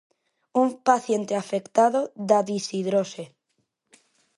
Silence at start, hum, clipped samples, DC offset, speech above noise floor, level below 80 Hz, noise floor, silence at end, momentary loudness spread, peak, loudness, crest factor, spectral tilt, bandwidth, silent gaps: 0.55 s; none; under 0.1%; under 0.1%; 52 dB; -76 dBFS; -75 dBFS; 1.1 s; 7 LU; -6 dBFS; -24 LUFS; 20 dB; -5 dB/octave; 11.5 kHz; none